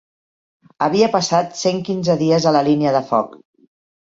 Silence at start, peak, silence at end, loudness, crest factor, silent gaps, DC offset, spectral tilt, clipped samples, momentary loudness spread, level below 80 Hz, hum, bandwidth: 0.8 s; -2 dBFS; 0.7 s; -17 LUFS; 16 dB; none; under 0.1%; -5.5 dB/octave; under 0.1%; 6 LU; -58 dBFS; none; 7.8 kHz